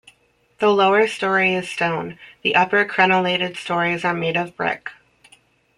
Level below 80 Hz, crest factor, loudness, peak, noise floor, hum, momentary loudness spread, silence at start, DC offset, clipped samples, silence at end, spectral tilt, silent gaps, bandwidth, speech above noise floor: -62 dBFS; 20 dB; -19 LUFS; -2 dBFS; -60 dBFS; none; 9 LU; 0.6 s; under 0.1%; under 0.1%; 0.85 s; -5 dB/octave; none; 11.5 kHz; 41 dB